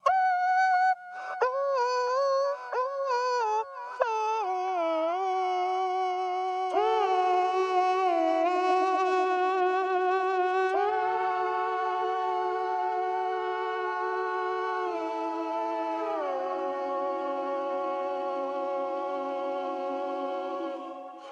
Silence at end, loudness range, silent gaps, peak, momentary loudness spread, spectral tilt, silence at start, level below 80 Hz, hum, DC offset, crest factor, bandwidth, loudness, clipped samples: 0 s; 6 LU; none; -10 dBFS; 7 LU; -2.5 dB/octave; 0.05 s; -78 dBFS; none; under 0.1%; 18 dB; 8.6 kHz; -28 LUFS; under 0.1%